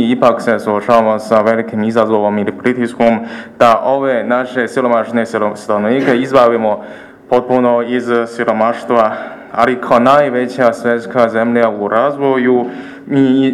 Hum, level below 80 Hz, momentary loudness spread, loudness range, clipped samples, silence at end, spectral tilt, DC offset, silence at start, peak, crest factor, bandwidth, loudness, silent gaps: none; -54 dBFS; 6 LU; 1 LU; 0.3%; 0 s; -6.5 dB/octave; under 0.1%; 0 s; 0 dBFS; 12 dB; 12.5 kHz; -13 LUFS; none